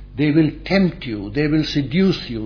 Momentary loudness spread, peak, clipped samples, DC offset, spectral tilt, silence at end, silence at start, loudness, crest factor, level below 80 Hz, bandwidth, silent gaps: 5 LU; -2 dBFS; under 0.1%; under 0.1%; -7.5 dB/octave; 0 s; 0 s; -19 LUFS; 18 dB; -38 dBFS; 5.4 kHz; none